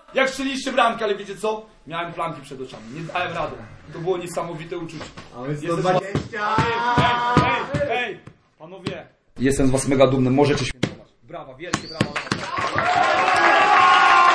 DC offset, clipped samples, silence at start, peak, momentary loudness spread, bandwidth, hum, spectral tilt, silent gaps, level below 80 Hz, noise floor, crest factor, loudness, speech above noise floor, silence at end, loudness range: under 0.1%; under 0.1%; 0.1 s; -2 dBFS; 19 LU; 11 kHz; none; -4.5 dB/octave; none; -44 dBFS; -45 dBFS; 20 dB; -20 LUFS; 22 dB; 0 s; 8 LU